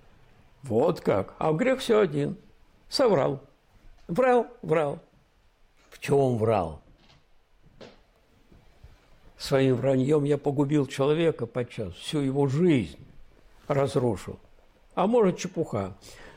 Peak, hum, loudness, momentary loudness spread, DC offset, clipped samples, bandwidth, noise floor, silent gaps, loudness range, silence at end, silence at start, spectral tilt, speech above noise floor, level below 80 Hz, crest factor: -12 dBFS; none; -26 LUFS; 13 LU; under 0.1%; under 0.1%; 16 kHz; -62 dBFS; none; 5 LU; 0.05 s; 0.65 s; -6.5 dB/octave; 37 dB; -56 dBFS; 14 dB